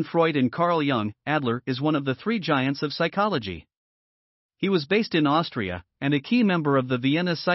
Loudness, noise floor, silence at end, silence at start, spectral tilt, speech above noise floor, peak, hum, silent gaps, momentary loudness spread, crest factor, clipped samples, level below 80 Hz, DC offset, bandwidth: -24 LUFS; under -90 dBFS; 0 s; 0 s; -4.5 dB/octave; over 66 dB; -8 dBFS; none; 3.77-4.49 s; 8 LU; 16 dB; under 0.1%; -62 dBFS; under 0.1%; 6 kHz